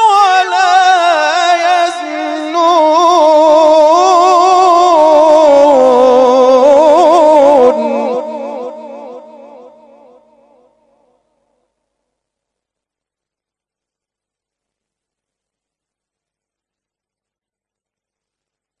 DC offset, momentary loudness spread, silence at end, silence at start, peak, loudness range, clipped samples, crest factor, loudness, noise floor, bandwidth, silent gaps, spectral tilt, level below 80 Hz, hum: under 0.1%; 12 LU; 9.6 s; 0 s; 0 dBFS; 9 LU; 1%; 10 dB; -8 LUFS; -88 dBFS; 11 kHz; none; -2.5 dB/octave; -58 dBFS; none